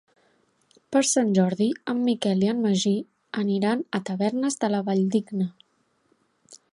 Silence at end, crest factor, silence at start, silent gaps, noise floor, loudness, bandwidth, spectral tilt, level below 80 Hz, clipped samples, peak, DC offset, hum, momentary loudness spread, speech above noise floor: 0.15 s; 18 dB; 0.9 s; none; -69 dBFS; -24 LUFS; 11.5 kHz; -5 dB/octave; -70 dBFS; under 0.1%; -8 dBFS; under 0.1%; none; 8 LU; 45 dB